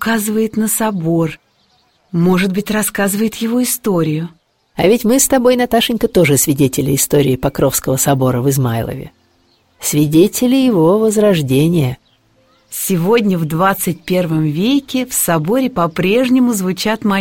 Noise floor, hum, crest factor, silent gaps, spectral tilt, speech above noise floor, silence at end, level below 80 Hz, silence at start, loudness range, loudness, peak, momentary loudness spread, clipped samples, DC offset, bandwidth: -56 dBFS; none; 14 dB; none; -5 dB/octave; 43 dB; 0 s; -44 dBFS; 0 s; 4 LU; -14 LUFS; 0 dBFS; 6 LU; under 0.1%; 0.2%; 17 kHz